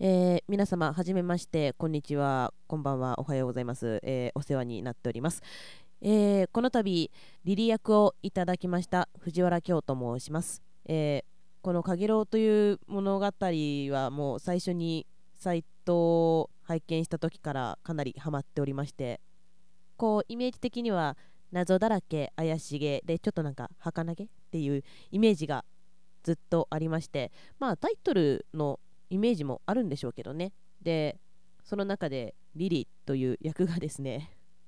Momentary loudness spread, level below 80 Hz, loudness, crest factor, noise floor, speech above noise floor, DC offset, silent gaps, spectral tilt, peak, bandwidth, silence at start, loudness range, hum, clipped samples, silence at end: 11 LU; -64 dBFS; -31 LUFS; 18 dB; -71 dBFS; 42 dB; 0.4%; none; -7 dB/octave; -12 dBFS; 11 kHz; 0 s; 5 LU; none; under 0.1%; 0.4 s